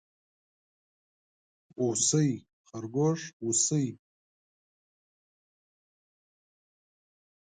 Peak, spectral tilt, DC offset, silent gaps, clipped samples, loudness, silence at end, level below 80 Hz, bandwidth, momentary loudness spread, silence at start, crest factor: -12 dBFS; -4.5 dB/octave; under 0.1%; 2.53-2.64 s, 3.33-3.40 s; under 0.1%; -28 LUFS; 3.5 s; -74 dBFS; 9.6 kHz; 14 LU; 1.8 s; 22 dB